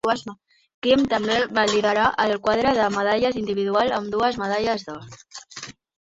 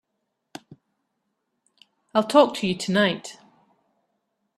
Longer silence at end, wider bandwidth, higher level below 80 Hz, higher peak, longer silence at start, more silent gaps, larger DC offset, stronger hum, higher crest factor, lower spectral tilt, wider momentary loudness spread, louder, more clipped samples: second, 0.45 s vs 1.25 s; second, 8 kHz vs 13 kHz; first, -54 dBFS vs -68 dBFS; about the same, -4 dBFS vs -4 dBFS; second, 0.05 s vs 2.15 s; first, 0.74-0.82 s vs none; neither; neither; second, 18 dB vs 24 dB; about the same, -4 dB/octave vs -5 dB/octave; second, 18 LU vs 26 LU; about the same, -21 LUFS vs -22 LUFS; neither